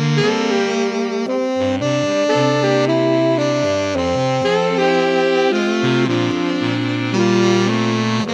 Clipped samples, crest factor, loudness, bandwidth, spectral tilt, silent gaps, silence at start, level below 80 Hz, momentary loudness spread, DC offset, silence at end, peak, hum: under 0.1%; 14 dB; -17 LUFS; 11 kHz; -5.5 dB/octave; none; 0 s; -56 dBFS; 4 LU; under 0.1%; 0 s; -2 dBFS; none